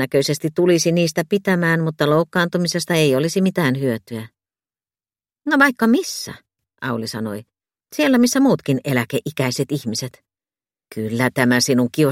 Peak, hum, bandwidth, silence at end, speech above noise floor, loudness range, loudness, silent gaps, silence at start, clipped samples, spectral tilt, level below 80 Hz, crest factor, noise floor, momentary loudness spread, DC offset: 0 dBFS; none; 16.5 kHz; 0 s; over 72 dB; 4 LU; -18 LUFS; none; 0 s; under 0.1%; -5 dB/octave; -62 dBFS; 18 dB; under -90 dBFS; 13 LU; under 0.1%